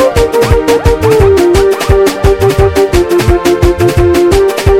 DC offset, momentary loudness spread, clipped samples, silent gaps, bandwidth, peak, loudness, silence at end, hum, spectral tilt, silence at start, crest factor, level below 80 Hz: under 0.1%; 3 LU; 1%; none; 17 kHz; 0 dBFS; -8 LUFS; 0 s; none; -6 dB/octave; 0 s; 8 dB; -16 dBFS